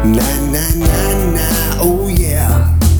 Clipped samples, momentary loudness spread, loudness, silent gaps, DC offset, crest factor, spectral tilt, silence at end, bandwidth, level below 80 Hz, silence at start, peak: under 0.1%; 2 LU; -14 LUFS; none; under 0.1%; 12 dB; -5.5 dB/octave; 0 s; over 20 kHz; -16 dBFS; 0 s; 0 dBFS